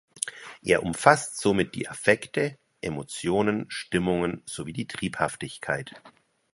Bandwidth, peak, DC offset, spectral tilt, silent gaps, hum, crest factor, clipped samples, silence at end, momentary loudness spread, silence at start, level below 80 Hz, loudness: 11.5 kHz; 0 dBFS; under 0.1%; -4.5 dB/octave; none; none; 26 dB; under 0.1%; 0.45 s; 14 LU; 0.15 s; -56 dBFS; -27 LUFS